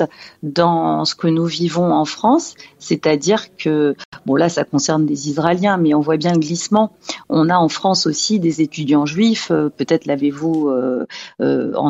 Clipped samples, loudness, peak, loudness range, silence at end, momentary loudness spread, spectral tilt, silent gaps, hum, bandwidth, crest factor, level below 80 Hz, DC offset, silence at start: under 0.1%; -17 LUFS; 0 dBFS; 2 LU; 0 s; 6 LU; -5 dB/octave; 4.05-4.12 s; none; 8 kHz; 16 dB; -58 dBFS; under 0.1%; 0 s